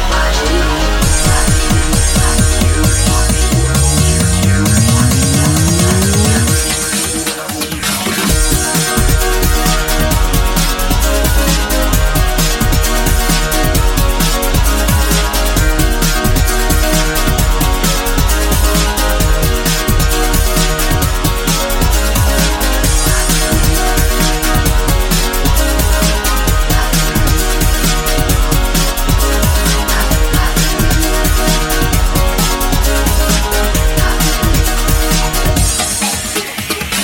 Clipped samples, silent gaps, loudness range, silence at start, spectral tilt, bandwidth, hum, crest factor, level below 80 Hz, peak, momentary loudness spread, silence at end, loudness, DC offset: under 0.1%; none; 2 LU; 0 s; -3.5 dB/octave; 17.5 kHz; none; 12 dB; -14 dBFS; 0 dBFS; 3 LU; 0 s; -13 LUFS; under 0.1%